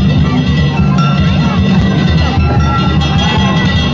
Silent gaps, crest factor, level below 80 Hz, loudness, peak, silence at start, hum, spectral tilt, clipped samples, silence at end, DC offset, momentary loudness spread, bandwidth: none; 8 dB; -18 dBFS; -11 LUFS; -2 dBFS; 0 s; none; -6.5 dB/octave; under 0.1%; 0 s; under 0.1%; 1 LU; 7.6 kHz